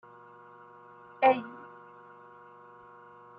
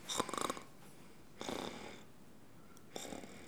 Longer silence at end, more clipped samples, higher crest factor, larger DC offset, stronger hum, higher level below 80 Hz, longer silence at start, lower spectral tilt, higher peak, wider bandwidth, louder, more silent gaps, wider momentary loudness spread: first, 1.85 s vs 0 s; neither; second, 24 dB vs 30 dB; second, under 0.1% vs 0.1%; neither; second, -84 dBFS vs -72 dBFS; first, 1.2 s vs 0 s; about the same, -2.5 dB/octave vs -2.5 dB/octave; first, -10 dBFS vs -18 dBFS; second, 5.2 kHz vs over 20 kHz; first, -27 LUFS vs -44 LUFS; neither; first, 27 LU vs 21 LU